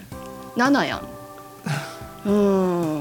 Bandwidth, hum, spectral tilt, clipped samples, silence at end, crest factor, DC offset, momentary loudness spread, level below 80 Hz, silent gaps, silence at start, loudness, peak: 17.5 kHz; none; -6 dB/octave; under 0.1%; 0 s; 16 dB; under 0.1%; 18 LU; -52 dBFS; none; 0 s; -22 LUFS; -6 dBFS